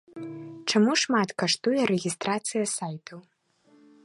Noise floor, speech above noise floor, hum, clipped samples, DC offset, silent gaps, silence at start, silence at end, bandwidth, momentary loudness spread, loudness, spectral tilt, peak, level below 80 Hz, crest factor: -62 dBFS; 36 dB; none; under 0.1%; under 0.1%; none; 0.15 s; 0.85 s; 11.5 kHz; 17 LU; -26 LUFS; -3.5 dB/octave; -10 dBFS; -74 dBFS; 18 dB